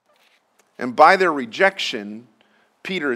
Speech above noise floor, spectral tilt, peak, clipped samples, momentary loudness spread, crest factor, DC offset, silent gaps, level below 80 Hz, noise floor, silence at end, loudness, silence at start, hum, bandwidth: 43 dB; -4 dB/octave; 0 dBFS; under 0.1%; 23 LU; 20 dB; under 0.1%; none; -72 dBFS; -61 dBFS; 0 s; -17 LUFS; 0.8 s; none; 14 kHz